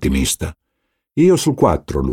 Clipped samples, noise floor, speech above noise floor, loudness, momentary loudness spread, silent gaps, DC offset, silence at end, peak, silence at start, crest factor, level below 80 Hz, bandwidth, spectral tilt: under 0.1%; -73 dBFS; 57 dB; -16 LUFS; 12 LU; none; under 0.1%; 0 s; 0 dBFS; 0 s; 16 dB; -30 dBFS; 17 kHz; -5.5 dB/octave